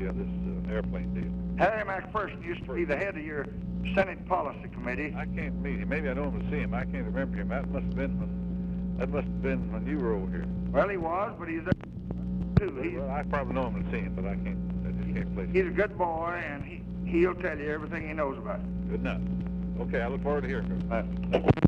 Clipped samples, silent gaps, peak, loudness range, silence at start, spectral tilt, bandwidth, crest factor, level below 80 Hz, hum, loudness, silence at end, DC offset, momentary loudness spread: under 0.1%; none; -6 dBFS; 2 LU; 0 s; -9.5 dB/octave; 6.2 kHz; 24 dB; -40 dBFS; 60 Hz at -40 dBFS; -31 LUFS; 0 s; under 0.1%; 7 LU